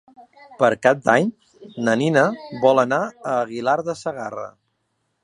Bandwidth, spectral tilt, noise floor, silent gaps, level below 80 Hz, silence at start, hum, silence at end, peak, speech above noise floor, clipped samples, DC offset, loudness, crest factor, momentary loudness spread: 11 kHz; -5.5 dB/octave; -72 dBFS; none; -68 dBFS; 0.2 s; none; 0.75 s; 0 dBFS; 52 dB; under 0.1%; under 0.1%; -20 LUFS; 20 dB; 13 LU